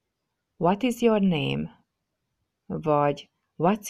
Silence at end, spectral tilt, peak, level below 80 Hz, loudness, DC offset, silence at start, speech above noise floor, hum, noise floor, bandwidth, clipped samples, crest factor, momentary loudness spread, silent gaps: 0 s; -6.5 dB/octave; -8 dBFS; -58 dBFS; -25 LUFS; under 0.1%; 0.6 s; 57 dB; none; -81 dBFS; 14.5 kHz; under 0.1%; 18 dB; 13 LU; none